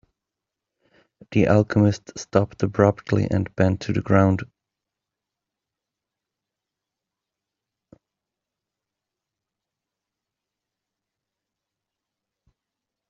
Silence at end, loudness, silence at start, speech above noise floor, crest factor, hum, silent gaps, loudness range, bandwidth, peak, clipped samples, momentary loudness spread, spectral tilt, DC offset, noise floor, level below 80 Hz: 8.65 s; -21 LUFS; 1.3 s; 66 dB; 24 dB; none; none; 6 LU; 7.4 kHz; -2 dBFS; under 0.1%; 8 LU; -7.5 dB/octave; under 0.1%; -86 dBFS; -56 dBFS